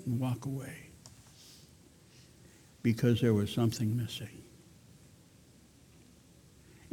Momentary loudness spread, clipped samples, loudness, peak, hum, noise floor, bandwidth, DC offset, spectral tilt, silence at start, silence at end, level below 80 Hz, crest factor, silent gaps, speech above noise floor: 26 LU; under 0.1%; -32 LUFS; -14 dBFS; none; -60 dBFS; 16.5 kHz; under 0.1%; -6.5 dB/octave; 0 s; 2.5 s; -64 dBFS; 20 dB; none; 29 dB